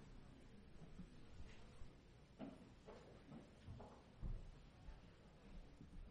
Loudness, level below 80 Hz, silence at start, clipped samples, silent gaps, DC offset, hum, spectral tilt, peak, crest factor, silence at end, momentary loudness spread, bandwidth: -62 LUFS; -60 dBFS; 0 s; under 0.1%; none; under 0.1%; none; -6.5 dB/octave; -40 dBFS; 18 dB; 0 s; 8 LU; 10 kHz